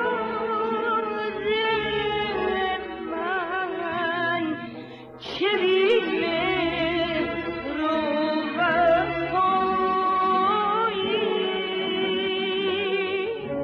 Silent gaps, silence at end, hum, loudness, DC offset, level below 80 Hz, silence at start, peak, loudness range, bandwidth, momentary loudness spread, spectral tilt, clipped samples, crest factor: none; 0 s; none; -24 LUFS; under 0.1%; -54 dBFS; 0 s; -10 dBFS; 4 LU; 6.4 kHz; 7 LU; -6.5 dB/octave; under 0.1%; 14 dB